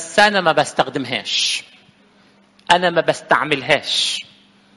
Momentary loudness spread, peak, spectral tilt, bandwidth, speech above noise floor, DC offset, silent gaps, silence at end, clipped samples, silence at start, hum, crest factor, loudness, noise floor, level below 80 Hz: 7 LU; 0 dBFS; -2.5 dB/octave; 11.5 kHz; 36 dB; under 0.1%; none; 0.55 s; under 0.1%; 0 s; 50 Hz at -55 dBFS; 20 dB; -17 LUFS; -53 dBFS; -56 dBFS